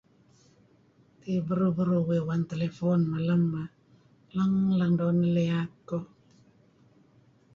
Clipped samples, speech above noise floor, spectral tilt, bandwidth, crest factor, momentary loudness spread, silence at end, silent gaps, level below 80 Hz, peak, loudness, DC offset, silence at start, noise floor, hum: under 0.1%; 36 dB; -9.5 dB/octave; 6.8 kHz; 14 dB; 11 LU; 1.5 s; none; -64 dBFS; -16 dBFS; -28 LUFS; under 0.1%; 1.25 s; -62 dBFS; none